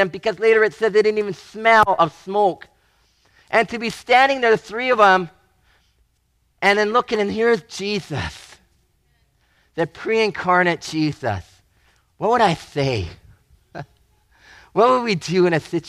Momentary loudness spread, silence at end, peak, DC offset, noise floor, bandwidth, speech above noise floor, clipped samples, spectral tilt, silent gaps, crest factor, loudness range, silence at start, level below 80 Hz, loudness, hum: 13 LU; 0 s; -2 dBFS; under 0.1%; -65 dBFS; 13 kHz; 47 dB; under 0.1%; -5 dB/octave; none; 18 dB; 6 LU; 0 s; -52 dBFS; -18 LUFS; none